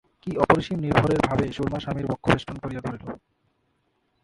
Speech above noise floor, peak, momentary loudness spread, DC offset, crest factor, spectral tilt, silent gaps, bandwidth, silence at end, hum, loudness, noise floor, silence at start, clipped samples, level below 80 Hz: 47 dB; 0 dBFS; 13 LU; under 0.1%; 24 dB; -7 dB/octave; none; 11.5 kHz; 1.05 s; none; -24 LUFS; -71 dBFS; 0.25 s; under 0.1%; -46 dBFS